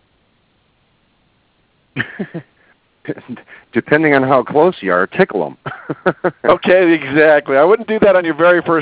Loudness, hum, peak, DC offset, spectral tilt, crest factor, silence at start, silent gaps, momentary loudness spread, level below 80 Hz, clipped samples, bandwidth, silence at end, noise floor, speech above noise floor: -13 LUFS; none; 0 dBFS; under 0.1%; -10 dB/octave; 14 dB; 1.95 s; none; 18 LU; -54 dBFS; under 0.1%; 4 kHz; 0 s; -59 dBFS; 45 dB